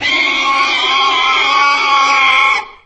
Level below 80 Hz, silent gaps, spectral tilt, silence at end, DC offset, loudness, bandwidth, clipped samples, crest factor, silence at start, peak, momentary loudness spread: -52 dBFS; none; 0.5 dB/octave; 0.15 s; under 0.1%; -10 LUFS; 8.6 kHz; under 0.1%; 12 dB; 0 s; 0 dBFS; 3 LU